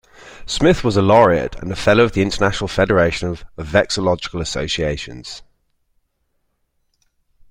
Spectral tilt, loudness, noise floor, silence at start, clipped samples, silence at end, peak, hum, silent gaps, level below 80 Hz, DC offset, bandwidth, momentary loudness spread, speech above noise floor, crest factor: -5 dB/octave; -17 LUFS; -68 dBFS; 0.25 s; under 0.1%; 2.1 s; 0 dBFS; none; none; -38 dBFS; under 0.1%; 15.5 kHz; 16 LU; 51 dB; 18 dB